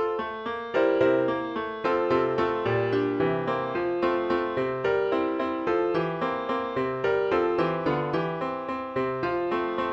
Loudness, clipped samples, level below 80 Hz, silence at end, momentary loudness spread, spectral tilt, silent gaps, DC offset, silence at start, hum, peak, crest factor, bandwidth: -26 LUFS; under 0.1%; -58 dBFS; 0 s; 5 LU; -7.5 dB/octave; none; under 0.1%; 0 s; none; -10 dBFS; 16 dB; 7.4 kHz